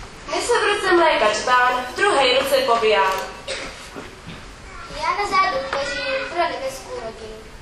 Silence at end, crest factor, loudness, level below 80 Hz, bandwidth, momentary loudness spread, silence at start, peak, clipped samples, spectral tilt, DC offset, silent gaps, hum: 0 s; 18 dB; -19 LUFS; -46 dBFS; 13.5 kHz; 20 LU; 0 s; -4 dBFS; under 0.1%; -2.5 dB/octave; under 0.1%; none; none